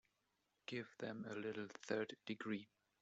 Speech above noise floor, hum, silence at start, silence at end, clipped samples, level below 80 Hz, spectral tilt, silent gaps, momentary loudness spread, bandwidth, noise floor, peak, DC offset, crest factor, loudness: 39 dB; none; 0.7 s; 0.35 s; under 0.1%; -88 dBFS; -4 dB/octave; none; 6 LU; 8 kHz; -86 dBFS; -26 dBFS; under 0.1%; 22 dB; -48 LUFS